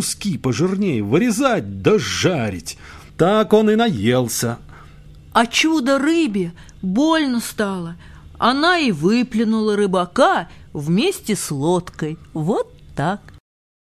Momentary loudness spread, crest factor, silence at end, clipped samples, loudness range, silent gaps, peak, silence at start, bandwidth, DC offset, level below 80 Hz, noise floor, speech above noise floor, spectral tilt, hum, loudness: 13 LU; 18 dB; 0.6 s; under 0.1%; 2 LU; none; -2 dBFS; 0 s; 15 kHz; under 0.1%; -46 dBFS; -42 dBFS; 24 dB; -5 dB/octave; none; -18 LUFS